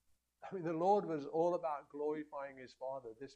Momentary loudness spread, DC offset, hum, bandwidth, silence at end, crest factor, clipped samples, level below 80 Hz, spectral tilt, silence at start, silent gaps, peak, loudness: 15 LU; under 0.1%; none; 9 kHz; 0 s; 18 dB; under 0.1%; -82 dBFS; -7.5 dB/octave; 0.4 s; none; -22 dBFS; -39 LUFS